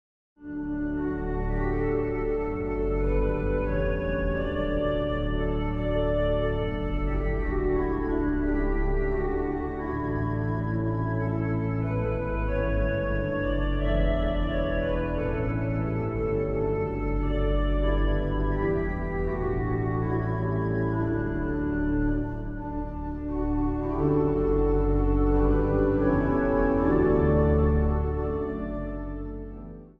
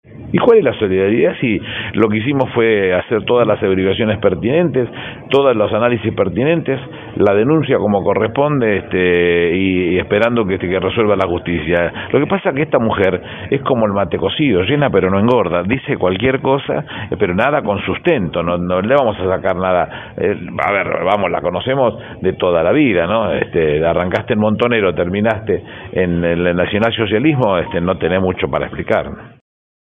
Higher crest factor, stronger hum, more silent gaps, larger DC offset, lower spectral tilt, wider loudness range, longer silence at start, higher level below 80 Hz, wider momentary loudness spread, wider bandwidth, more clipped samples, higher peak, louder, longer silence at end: about the same, 14 dB vs 14 dB; neither; neither; neither; about the same, -10 dB/octave vs -9 dB/octave; about the same, 4 LU vs 2 LU; first, 0.4 s vs 0.1 s; first, -30 dBFS vs -42 dBFS; about the same, 7 LU vs 6 LU; about the same, 3.8 kHz vs 3.9 kHz; neither; second, -10 dBFS vs 0 dBFS; second, -27 LUFS vs -15 LUFS; second, 0.1 s vs 0.65 s